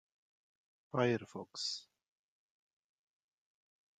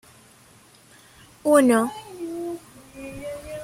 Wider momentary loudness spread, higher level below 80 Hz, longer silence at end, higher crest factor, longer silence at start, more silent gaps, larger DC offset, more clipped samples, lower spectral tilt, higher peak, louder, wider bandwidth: second, 11 LU vs 22 LU; second, -84 dBFS vs -58 dBFS; first, 2.2 s vs 0 s; about the same, 24 dB vs 22 dB; second, 0.95 s vs 1.45 s; neither; neither; neither; about the same, -4.5 dB/octave vs -4.5 dB/octave; second, -18 dBFS vs -4 dBFS; second, -38 LUFS vs -23 LUFS; second, 9.4 kHz vs 16.5 kHz